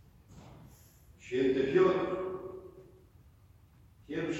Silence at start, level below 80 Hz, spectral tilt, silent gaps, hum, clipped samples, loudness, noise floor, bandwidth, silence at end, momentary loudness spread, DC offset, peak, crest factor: 0.3 s; -62 dBFS; -6.5 dB/octave; none; none; under 0.1%; -31 LUFS; -60 dBFS; 12.5 kHz; 0 s; 27 LU; under 0.1%; -16 dBFS; 20 dB